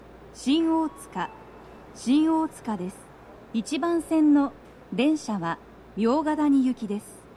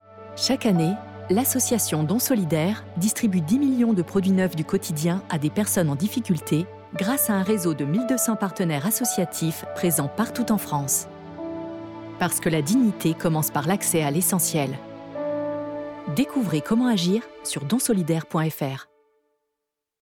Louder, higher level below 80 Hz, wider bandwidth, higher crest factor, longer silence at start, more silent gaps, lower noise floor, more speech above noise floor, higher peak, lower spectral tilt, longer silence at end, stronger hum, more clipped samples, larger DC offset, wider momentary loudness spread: about the same, -25 LUFS vs -23 LUFS; about the same, -58 dBFS vs -60 dBFS; second, 12.5 kHz vs 20 kHz; about the same, 16 dB vs 12 dB; about the same, 0.2 s vs 0.1 s; neither; second, -46 dBFS vs -83 dBFS; second, 22 dB vs 60 dB; about the same, -10 dBFS vs -12 dBFS; about the same, -5.5 dB/octave vs -5 dB/octave; second, 0.15 s vs 1.2 s; neither; neither; neither; first, 13 LU vs 10 LU